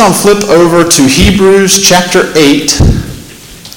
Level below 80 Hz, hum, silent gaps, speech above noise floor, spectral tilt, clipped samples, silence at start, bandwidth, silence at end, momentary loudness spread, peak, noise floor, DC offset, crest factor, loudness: -20 dBFS; none; none; 24 dB; -4 dB/octave; 0.6%; 0 s; over 20 kHz; 0.05 s; 5 LU; 0 dBFS; -29 dBFS; under 0.1%; 6 dB; -6 LUFS